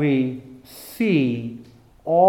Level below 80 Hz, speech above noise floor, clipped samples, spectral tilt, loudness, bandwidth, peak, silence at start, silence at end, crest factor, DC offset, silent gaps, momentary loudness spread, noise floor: -60 dBFS; 21 dB; under 0.1%; -7.5 dB/octave; -22 LUFS; 17.5 kHz; -4 dBFS; 0 s; 0 s; 18 dB; under 0.1%; none; 21 LU; -42 dBFS